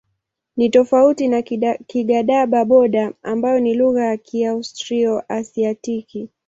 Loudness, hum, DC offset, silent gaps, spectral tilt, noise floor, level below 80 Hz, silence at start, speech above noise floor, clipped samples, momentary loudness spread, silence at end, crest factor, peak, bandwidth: -18 LUFS; none; under 0.1%; none; -5.5 dB/octave; -74 dBFS; -60 dBFS; 0.55 s; 57 dB; under 0.1%; 11 LU; 0.2 s; 16 dB; -2 dBFS; 7.8 kHz